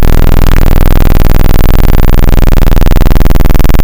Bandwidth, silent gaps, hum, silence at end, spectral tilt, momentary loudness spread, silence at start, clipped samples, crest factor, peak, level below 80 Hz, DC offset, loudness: 17 kHz; none; none; 0 s; -6.5 dB/octave; 0 LU; 0 s; 6%; 4 dB; 0 dBFS; -2 dBFS; 20%; -9 LUFS